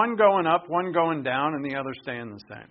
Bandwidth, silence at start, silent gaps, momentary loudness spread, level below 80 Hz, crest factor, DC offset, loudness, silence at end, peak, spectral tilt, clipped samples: 5.2 kHz; 0 s; none; 16 LU; -68 dBFS; 20 dB; under 0.1%; -25 LUFS; 0.05 s; -6 dBFS; -3.5 dB/octave; under 0.1%